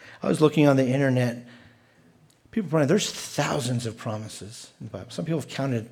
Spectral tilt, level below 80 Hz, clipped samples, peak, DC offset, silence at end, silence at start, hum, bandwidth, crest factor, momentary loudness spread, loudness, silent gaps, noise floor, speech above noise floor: -5.5 dB/octave; -66 dBFS; under 0.1%; -6 dBFS; under 0.1%; 0.05 s; 0 s; none; 17 kHz; 20 dB; 19 LU; -25 LUFS; none; -58 dBFS; 33 dB